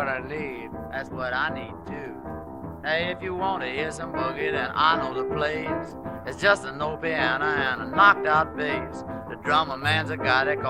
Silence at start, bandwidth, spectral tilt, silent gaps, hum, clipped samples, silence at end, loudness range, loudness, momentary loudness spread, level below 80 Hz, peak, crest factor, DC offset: 0 s; 15.5 kHz; -5 dB/octave; none; none; under 0.1%; 0 s; 7 LU; -25 LUFS; 14 LU; -50 dBFS; -4 dBFS; 22 dB; 0.1%